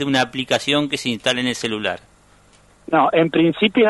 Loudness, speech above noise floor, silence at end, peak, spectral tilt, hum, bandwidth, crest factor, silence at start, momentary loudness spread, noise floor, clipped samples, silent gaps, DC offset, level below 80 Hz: -19 LUFS; 34 dB; 0 s; -2 dBFS; -4.5 dB/octave; 50 Hz at -55 dBFS; 11.5 kHz; 16 dB; 0 s; 7 LU; -52 dBFS; under 0.1%; none; under 0.1%; -56 dBFS